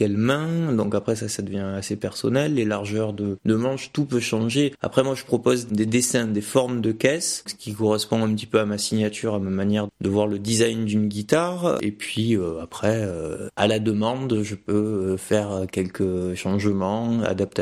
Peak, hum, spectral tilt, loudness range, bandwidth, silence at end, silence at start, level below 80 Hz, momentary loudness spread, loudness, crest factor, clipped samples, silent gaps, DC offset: -4 dBFS; none; -5 dB/octave; 2 LU; 14 kHz; 0 s; 0 s; -56 dBFS; 6 LU; -23 LUFS; 18 dB; under 0.1%; none; under 0.1%